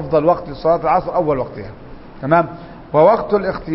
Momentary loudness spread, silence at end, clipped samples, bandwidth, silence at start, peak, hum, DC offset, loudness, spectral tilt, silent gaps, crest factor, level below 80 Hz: 16 LU; 0 s; under 0.1%; 5.8 kHz; 0 s; 0 dBFS; none; under 0.1%; -16 LUFS; -12 dB/octave; none; 16 dB; -40 dBFS